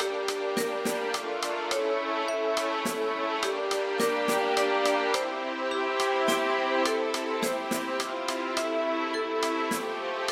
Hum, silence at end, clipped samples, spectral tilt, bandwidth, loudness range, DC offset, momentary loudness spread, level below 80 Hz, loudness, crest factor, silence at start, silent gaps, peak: none; 0 s; under 0.1%; -2.5 dB/octave; 16 kHz; 3 LU; under 0.1%; 5 LU; -72 dBFS; -28 LUFS; 16 dB; 0 s; none; -12 dBFS